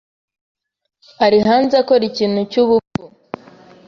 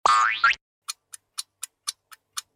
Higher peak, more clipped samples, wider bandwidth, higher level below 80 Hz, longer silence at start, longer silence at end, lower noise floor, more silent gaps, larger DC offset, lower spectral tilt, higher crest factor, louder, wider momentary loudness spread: first, -2 dBFS vs -6 dBFS; neither; second, 7.2 kHz vs 16.5 kHz; first, -54 dBFS vs -64 dBFS; first, 1.2 s vs 0.05 s; first, 0.8 s vs 0.15 s; about the same, -43 dBFS vs -41 dBFS; second, 2.87-2.91 s vs 0.61-0.82 s; neither; first, -6.5 dB/octave vs 2 dB/octave; about the same, 16 dB vs 20 dB; first, -15 LUFS vs -24 LUFS; first, 21 LU vs 17 LU